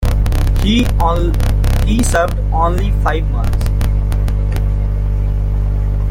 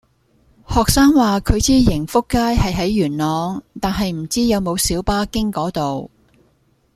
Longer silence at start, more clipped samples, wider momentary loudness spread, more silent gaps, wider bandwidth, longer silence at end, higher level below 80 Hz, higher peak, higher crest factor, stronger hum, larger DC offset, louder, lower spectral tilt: second, 0 s vs 0.7 s; neither; second, 4 LU vs 10 LU; neither; about the same, 16 kHz vs 15.5 kHz; second, 0 s vs 0.9 s; first, -14 dBFS vs -30 dBFS; about the same, -2 dBFS vs -2 dBFS; about the same, 12 dB vs 16 dB; first, 50 Hz at -20 dBFS vs none; neither; about the same, -16 LUFS vs -17 LUFS; about the same, -6 dB/octave vs -5 dB/octave